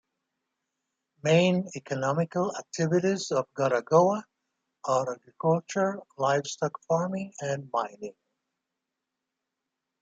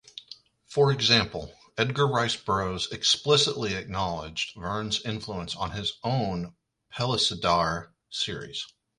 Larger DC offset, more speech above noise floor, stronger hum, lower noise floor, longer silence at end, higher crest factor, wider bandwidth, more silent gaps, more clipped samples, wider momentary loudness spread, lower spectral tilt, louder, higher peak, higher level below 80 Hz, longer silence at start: neither; first, 59 dB vs 24 dB; neither; first, -86 dBFS vs -51 dBFS; first, 1.9 s vs 0.3 s; about the same, 20 dB vs 20 dB; second, 9.2 kHz vs 11.5 kHz; neither; neither; second, 11 LU vs 15 LU; first, -5.5 dB/octave vs -4 dB/octave; about the same, -28 LUFS vs -26 LUFS; about the same, -8 dBFS vs -8 dBFS; second, -74 dBFS vs -52 dBFS; first, 1.25 s vs 0.15 s